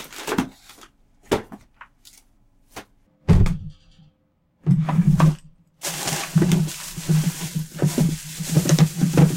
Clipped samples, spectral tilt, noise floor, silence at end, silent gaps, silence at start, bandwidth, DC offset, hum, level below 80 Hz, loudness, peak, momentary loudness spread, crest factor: under 0.1%; -6 dB/octave; -65 dBFS; 0 s; none; 0 s; 16.5 kHz; under 0.1%; none; -34 dBFS; -22 LUFS; -4 dBFS; 15 LU; 18 dB